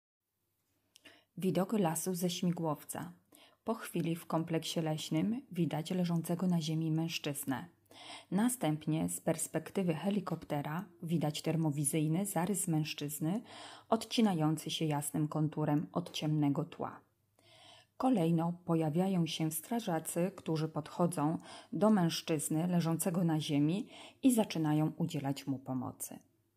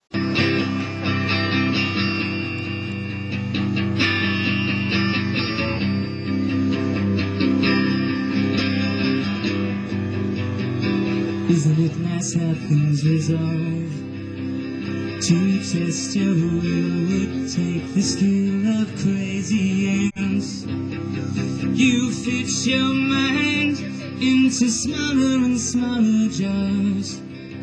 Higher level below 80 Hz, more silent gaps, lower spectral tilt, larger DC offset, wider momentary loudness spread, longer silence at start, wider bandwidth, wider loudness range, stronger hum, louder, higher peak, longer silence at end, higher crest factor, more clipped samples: second, -78 dBFS vs -52 dBFS; neither; about the same, -5.5 dB/octave vs -5 dB/octave; neither; about the same, 9 LU vs 8 LU; first, 1.05 s vs 0.1 s; first, 15.5 kHz vs 10 kHz; about the same, 4 LU vs 3 LU; neither; second, -35 LUFS vs -21 LUFS; second, -16 dBFS vs -6 dBFS; first, 0.4 s vs 0 s; about the same, 18 dB vs 16 dB; neither